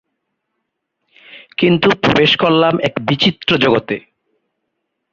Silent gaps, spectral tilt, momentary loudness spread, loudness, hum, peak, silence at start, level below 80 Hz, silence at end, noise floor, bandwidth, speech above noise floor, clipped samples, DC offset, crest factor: none; -6 dB/octave; 8 LU; -13 LUFS; none; 0 dBFS; 1.35 s; -50 dBFS; 1.15 s; -74 dBFS; 7.4 kHz; 60 dB; under 0.1%; under 0.1%; 16 dB